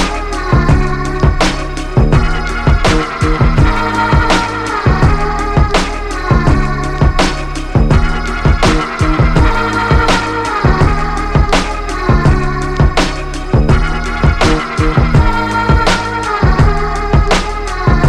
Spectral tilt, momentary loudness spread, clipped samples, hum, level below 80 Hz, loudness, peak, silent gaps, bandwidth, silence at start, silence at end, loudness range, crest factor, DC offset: -6 dB/octave; 5 LU; under 0.1%; none; -16 dBFS; -13 LUFS; 0 dBFS; none; 11.5 kHz; 0 s; 0 s; 1 LU; 12 dB; under 0.1%